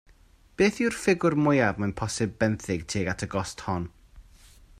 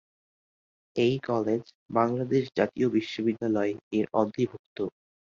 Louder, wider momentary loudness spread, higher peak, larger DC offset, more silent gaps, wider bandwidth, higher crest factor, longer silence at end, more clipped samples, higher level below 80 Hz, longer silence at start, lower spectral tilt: about the same, -26 LUFS vs -28 LUFS; about the same, 9 LU vs 9 LU; about the same, -8 dBFS vs -8 dBFS; neither; second, none vs 1.75-1.89 s, 3.81-3.91 s, 4.59-4.76 s; first, 14.5 kHz vs 7.4 kHz; about the same, 18 dB vs 20 dB; about the same, 0.6 s vs 0.5 s; neither; first, -52 dBFS vs -66 dBFS; second, 0.6 s vs 0.95 s; second, -5.5 dB/octave vs -7.5 dB/octave